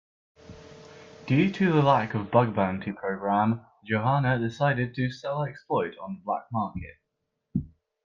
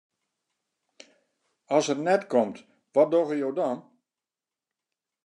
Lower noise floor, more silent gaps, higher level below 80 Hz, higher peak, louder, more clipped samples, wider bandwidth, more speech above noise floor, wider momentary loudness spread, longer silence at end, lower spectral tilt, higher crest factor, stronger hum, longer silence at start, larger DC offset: second, -80 dBFS vs under -90 dBFS; neither; first, -58 dBFS vs -88 dBFS; about the same, -6 dBFS vs -8 dBFS; about the same, -27 LUFS vs -26 LUFS; neither; second, 7.2 kHz vs 10.5 kHz; second, 55 dB vs over 66 dB; about the same, 11 LU vs 9 LU; second, 0.4 s vs 1.45 s; first, -8 dB/octave vs -5 dB/octave; about the same, 20 dB vs 20 dB; neither; second, 0.5 s vs 1.7 s; neither